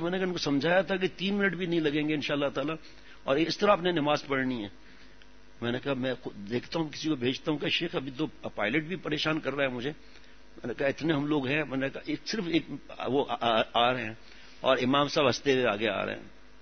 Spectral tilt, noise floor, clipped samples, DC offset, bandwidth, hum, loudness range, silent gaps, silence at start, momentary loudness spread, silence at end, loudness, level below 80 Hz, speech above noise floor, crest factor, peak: -5 dB/octave; -56 dBFS; under 0.1%; 0.4%; 6.6 kHz; none; 5 LU; none; 0 s; 11 LU; 0.3 s; -29 LUFS; -60 dBFS; 27 dB; 22 dB; -8 dBFS